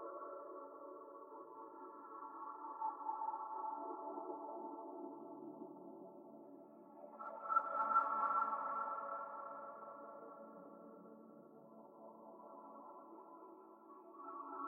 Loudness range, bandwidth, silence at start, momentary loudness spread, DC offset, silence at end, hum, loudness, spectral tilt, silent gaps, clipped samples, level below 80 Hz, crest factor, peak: 17 LU; 3.8 kHz; 0 s; 22 LU; under 0.1%; 0 s; none; -44 LUFS; -5.5 dB/octave; none; under 0.1%; under -90 dBFS; 24 dB; -24 dBFS